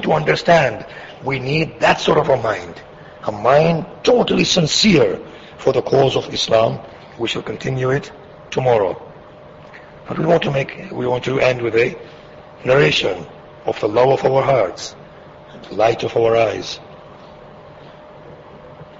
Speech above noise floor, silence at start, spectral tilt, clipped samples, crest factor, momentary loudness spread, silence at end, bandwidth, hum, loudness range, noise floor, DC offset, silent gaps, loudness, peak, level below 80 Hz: 23 dB; 0 s; -5 dB/octave; under 0.1%; 16 dB; 17 LU; 0.15 s; 8 kHz; none; 6 LU; -40 dBFS; under 0.1%; none; -17 LUFS; -2 dBFS; -48 dBFS